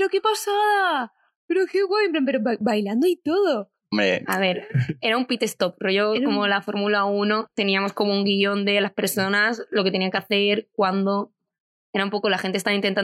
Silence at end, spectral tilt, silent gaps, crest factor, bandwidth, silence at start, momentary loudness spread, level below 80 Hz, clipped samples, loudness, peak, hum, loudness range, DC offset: 0 s; -4.5 dB/octave; 1.36-1.48 s, 11.60-11.93 s; 16 dB; 14.5 kHz; 0 s; 5 LU; -70 dBFS; under 0.1%; -22 LUFS; -6 dBFS; none; 2 LU; under 0.1%